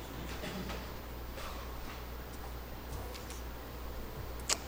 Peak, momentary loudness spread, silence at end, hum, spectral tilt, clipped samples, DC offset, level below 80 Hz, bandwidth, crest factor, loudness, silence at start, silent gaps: -8 dBFS; 4 LU; 0 s; none; -3 dB/octave; under 0.1%; under 0.1%; -46 dBFS; 16.5 kHz; 34 dB; -43 LUFS; 0 s; none